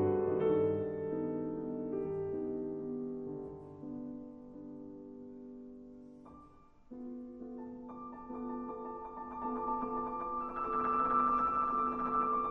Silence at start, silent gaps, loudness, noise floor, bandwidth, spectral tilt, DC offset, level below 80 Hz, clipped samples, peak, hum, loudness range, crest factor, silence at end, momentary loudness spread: 0 s; none; -36 LUFS; -59 dBFS; 5.8 kHz; -10 dB/octave; under 0.1%; -62 dBFS; under 0.1%; -20 dBFS; none; 16 LU; 16 dB; 0 s; 19 LU